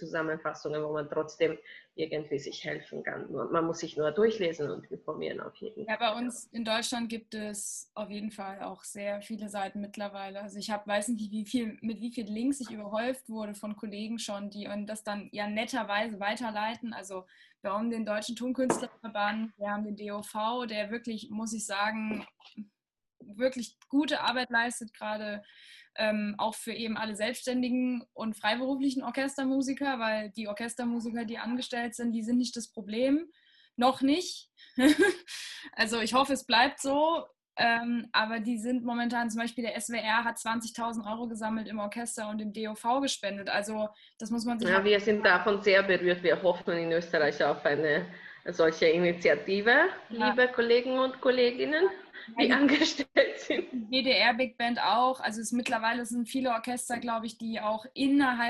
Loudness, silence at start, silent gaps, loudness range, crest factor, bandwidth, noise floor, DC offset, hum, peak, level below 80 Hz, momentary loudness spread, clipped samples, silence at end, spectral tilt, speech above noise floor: -30 LUFS; 0 s; none; 9 LU; 20 dB; 12.5 kHz; -67 dBFS; under 0.1%; none; -10 dBFS; -70 dBFS; 13 LU; under 0.1%; 0 s; -3.5 dB/octave; 37 dB